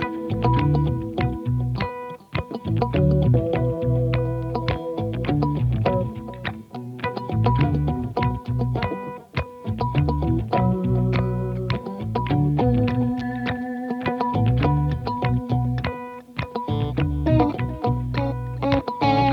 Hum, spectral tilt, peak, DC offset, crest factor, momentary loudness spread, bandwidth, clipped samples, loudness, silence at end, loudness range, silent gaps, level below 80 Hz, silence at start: none; -9 dB/octave; -6 dBFS; under 0.1%; 16 dB; 10 LU; 5.8 kHz; under 0.1%; -23 LUFS; 0 s; 2 LU; none; -34 dBFS; 0 s